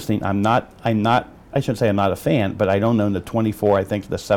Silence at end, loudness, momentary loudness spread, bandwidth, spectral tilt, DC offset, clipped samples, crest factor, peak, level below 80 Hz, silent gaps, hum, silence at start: 0 s; -20 LUFS; 5 LU; 18 kHz; -7 dB/octave; under 0.1%; under 0.1%; 14 dB; -6 dBFS; -48 dBFS; none; none; 0 s